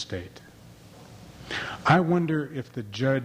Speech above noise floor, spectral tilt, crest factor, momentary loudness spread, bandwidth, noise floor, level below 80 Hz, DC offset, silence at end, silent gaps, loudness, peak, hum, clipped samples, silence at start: 24 dB; -6.5 dB/octave; 20 dB; 24 LU; 15 kHz; -49 dBFS; -58 dBFS; under 0.1%; 0 s; none; -26 LUFS; -6 dBFS; none; under 0.1%; 0 s